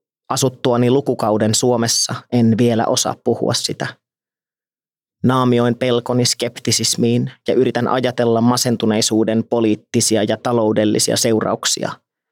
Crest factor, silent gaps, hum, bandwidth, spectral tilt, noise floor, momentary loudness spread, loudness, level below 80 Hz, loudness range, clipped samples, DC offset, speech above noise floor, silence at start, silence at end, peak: 14 dB; none; none; 17 kHz; -4.5 dB/octave; under -90 dBFS; 4 LU; -16 LUFS; -68 dBFS; 3 LU; under 0.1%; under 0.1%; over 74 dB; 0.3 s; 0.35 s; -4 dBFS